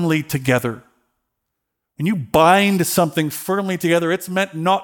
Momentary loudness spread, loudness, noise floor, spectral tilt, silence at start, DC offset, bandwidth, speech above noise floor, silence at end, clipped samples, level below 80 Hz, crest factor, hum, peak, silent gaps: 9 LU; -18 LUFS; -78 dBFS; -5 dB/octave; 0 s; under 0.1%; 19 kHz; 60 dB; 0 s; under 0.1%; -52 dBFS; 18 dB; none; 0 dBFS; none